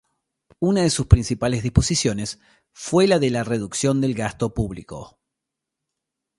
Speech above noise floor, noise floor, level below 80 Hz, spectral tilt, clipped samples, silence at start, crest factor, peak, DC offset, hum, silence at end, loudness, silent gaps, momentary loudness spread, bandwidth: 63 dB; -83 dBFS; -34 dBFS; -5.5 dB/octave; under 0.1%; 0.6 s; 22 dB; 0 dBFS; under 0.1%; none; 1.3 s; -21 LUFS; none; 16 LU; 11.5 kHz